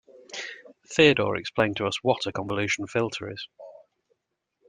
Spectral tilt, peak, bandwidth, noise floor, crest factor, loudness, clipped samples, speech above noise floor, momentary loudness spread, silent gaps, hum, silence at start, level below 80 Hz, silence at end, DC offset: -4.5 dB/octave; -4 dBFS; 10 kHz; -79 dBFS; 22 dB; -25 LUFS; under 0.1%; 54 dB; 20 LU; none; none; 0.3 s; -62 dBFS; 0.95 s; under 0.1%